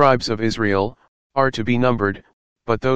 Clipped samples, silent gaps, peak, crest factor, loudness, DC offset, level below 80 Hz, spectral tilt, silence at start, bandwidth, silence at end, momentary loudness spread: under 0.1%; 1.08-1.30 s, 2.33-2.56 s; 0 dBFS; 18 dB; -20 LUFS; 2%; -46 dBFS; -6 dB/octave; 0 s; 9.2 kHz; 0 s; 9 LU